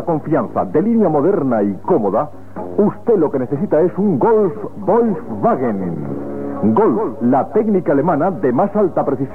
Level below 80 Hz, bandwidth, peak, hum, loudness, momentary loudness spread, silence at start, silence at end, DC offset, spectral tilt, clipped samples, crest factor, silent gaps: -54 dBFS; 3.4 kHz; -4 dBFS; none; -16 LUFS; 8 LU; 0 s; 0 s; 2%; -11 dB/octave; under 0.1%; 12 dB; none